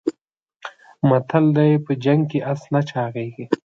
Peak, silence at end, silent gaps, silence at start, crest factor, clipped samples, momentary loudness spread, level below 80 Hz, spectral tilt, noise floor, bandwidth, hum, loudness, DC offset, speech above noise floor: -2 dBFS; 0.2 s; 0.21-0.25 s, 0.56-0.60 s; 0.05 s; 18 dB; under 0.1%; 20 LU; -64 dBFS; -9 dB/octave; -73 dBFS; 7.6 kHz; none; -20 LUFS; under 0.1%; 54 dB